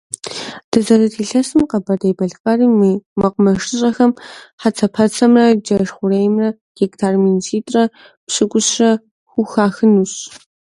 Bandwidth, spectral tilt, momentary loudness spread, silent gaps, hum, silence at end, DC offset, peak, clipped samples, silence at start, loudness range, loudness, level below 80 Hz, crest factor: 11.5 kHz; -5 dB/octave; 9 LU; 0.64-0.72 s, 2.40-2.44 s, 3.06-3.16 s, 4.53-4.58 s, 6.61-6.75 s, 8.17-8.27 s, 9.11-9.26 s; none; 0.4 s; under 0.1%; 0 dBFS; under 0.1%; 0.25 s; 2 LU; -15 LUFS; -52 dBFS; 16 dB